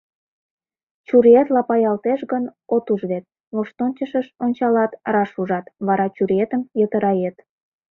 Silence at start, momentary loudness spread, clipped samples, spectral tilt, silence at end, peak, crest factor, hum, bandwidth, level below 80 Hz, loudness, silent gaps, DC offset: 1.1 s; 11 LU; under 0.1%; -10 dB/octave; 0.6 s; -2 dBFS; 18 dB; none; 4.1 kHz; -64 dBFS; -20 LUFS; 3.40-3.51 s; under 0.1%